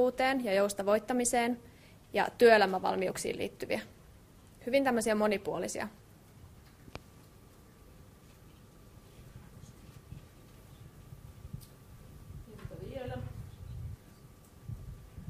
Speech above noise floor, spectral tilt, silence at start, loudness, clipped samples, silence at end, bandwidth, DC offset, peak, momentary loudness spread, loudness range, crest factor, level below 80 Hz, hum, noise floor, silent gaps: 27 dB; -4 dB/octave; 0 s; -31 LUFS; under 0.1%; 0 s; 15.5 kHz; under 0.1%; -10 dBFS; 25 LU; 25 LU; 24 dB; -58 dBFS; none; -57 dBFS; none